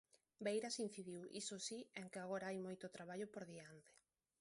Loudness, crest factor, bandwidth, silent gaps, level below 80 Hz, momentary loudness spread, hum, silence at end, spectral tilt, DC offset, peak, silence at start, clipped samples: -49 LUFS; 20 dB; 11.5 kHz; none; -90 dBFS; 11 LU; none; 0.5 s; -3.5 dB/octave; under 0.1%; -30 dBFS; 0.15 s; under 0.1%